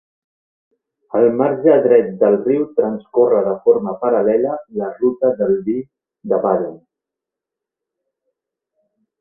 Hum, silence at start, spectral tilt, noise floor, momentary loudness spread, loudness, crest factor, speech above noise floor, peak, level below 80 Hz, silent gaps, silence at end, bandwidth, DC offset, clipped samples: none; 1.15 s; -12.5 dB/octave; -85 dBFS; 10 LU; -16 LUFS; 18 dB; 69 dB; 0 dBFS; -62 dBFS; none; 2.45 s; 3 kHz; under 0.1%; under 0.1%